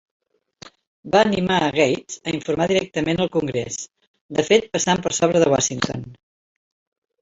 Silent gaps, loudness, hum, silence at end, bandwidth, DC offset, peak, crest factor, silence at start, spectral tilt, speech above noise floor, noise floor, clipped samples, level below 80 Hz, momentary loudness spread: 0.87-1.03 s, 4.07-4.14 s, 4.21-4.29 s; -20 LUFS; none; 1.1 s; 8 kHz; under 0.1%; -2 dBFS; 20 dB; 0.65 s; -4 dB/octave; 27 dB; -47 dBFS; under 0.1%; -54 dBFS; 9 LU